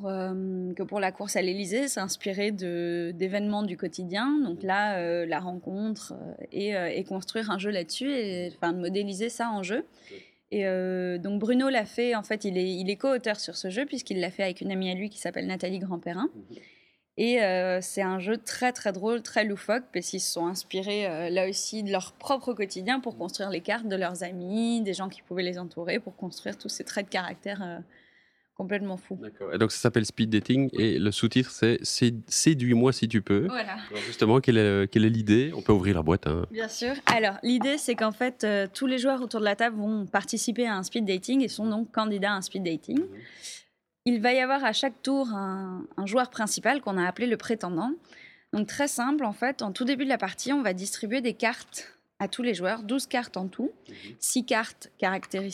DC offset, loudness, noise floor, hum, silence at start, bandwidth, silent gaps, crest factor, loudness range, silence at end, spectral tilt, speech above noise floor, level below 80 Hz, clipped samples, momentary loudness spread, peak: under 0.1%; -28 LUFS; -64 dBFS; none; 0 s; 15.5 kHz; none; 26 dB; 7 LU; 0 s; -4.5 dB/octave; 36 dB; -58 dBFS; under 0.1%; 11 LU; -2 dBFS